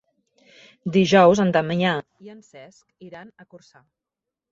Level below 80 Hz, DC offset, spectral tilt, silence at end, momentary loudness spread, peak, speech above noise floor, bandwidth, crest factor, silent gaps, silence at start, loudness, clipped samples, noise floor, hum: -62 dBFS; under 0.1%; -6 dB/octave; 0.95 s; 22 LU; -4 dBFS; 65 dB; 7.6 kHz; 20 dB; none; 0.85 s; -18 LUFS; under 0.1%; -86 dBFS; none